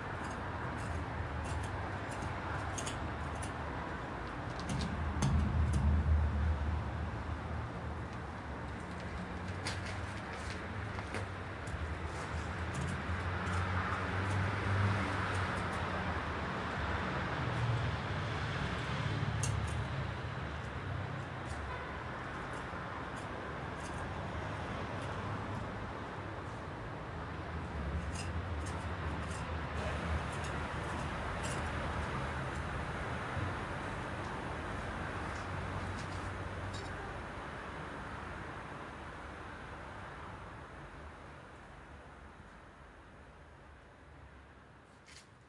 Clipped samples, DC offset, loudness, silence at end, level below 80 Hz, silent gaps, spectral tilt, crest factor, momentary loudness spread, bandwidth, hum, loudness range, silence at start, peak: under 0.1%; under 0.1%; -39 LUFS; 0 s; -46 dBFS; none; -5.5 dB/octave; 18 dB; 14 LU; 11.5 kHz; none; 11 LU; 0 s; -20 dBFS